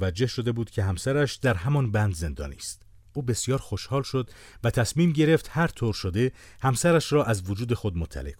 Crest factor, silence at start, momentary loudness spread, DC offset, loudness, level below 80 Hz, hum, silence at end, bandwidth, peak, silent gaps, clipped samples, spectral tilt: 18 dB; 0 s; 11 LU; under 0.1%; -26 LUFS; -44 dBFS; none; 0.05 s; 17 kHz; -8 dBFS; none; under 0.1%; -5.5 dB/octave